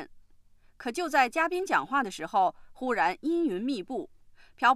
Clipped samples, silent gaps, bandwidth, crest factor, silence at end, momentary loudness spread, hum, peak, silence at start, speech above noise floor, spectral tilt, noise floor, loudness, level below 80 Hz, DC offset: under 0.1%; none; 15 kHz; 20 dB; 0 s; 12 LU; none; -10 dBFS; 0 s; 29 dB; -3.5 dB/octave; -57 dBFS; -28 LUFS; -62 dBFS; under 0.1%